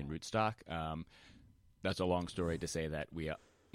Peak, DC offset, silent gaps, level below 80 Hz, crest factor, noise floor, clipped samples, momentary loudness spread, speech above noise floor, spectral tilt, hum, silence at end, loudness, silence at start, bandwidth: -20 dBFS; under 0.1%; none; -56 dBFS; 20 dB; -64 dBFS; under 0.1%; 8 LU; 25 dB; -5.5 dB/octave; none; 0.35 s; -39 LUFS; 0 s; 16 kHz